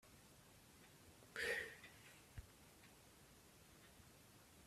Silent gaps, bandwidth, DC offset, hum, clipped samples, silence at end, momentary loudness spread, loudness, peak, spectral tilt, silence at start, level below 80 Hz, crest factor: none; 15.5 kHz; under 0.1%; none; under 0.1%; 0 s; 21 LU; -49 LUFS; -32 dBFS; -2.5 dB/octave; 0.05 s; -72 dBFS; 24 dB